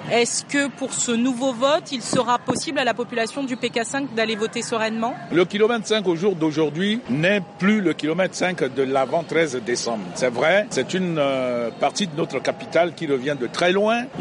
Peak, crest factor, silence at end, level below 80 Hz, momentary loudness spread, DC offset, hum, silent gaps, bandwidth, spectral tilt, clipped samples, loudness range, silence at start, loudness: -6 dBFS; 16 dB; 0 s; -66 dBFS; 5 LU; under 0.1%; none; none; 11.5 kHz; -4 dB/octave; under 0.1%; 2 LU; 0 s; -22 LUFS